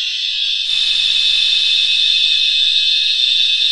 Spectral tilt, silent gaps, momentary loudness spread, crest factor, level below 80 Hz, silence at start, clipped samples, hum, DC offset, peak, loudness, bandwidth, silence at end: 4 dB/octave; none; 4 LU; 12 dB; -52 dBFS; 0 s; under 0.1%; none; 1%; -2 dBFS; -11 LUFS; 11.5 kHz; 0 s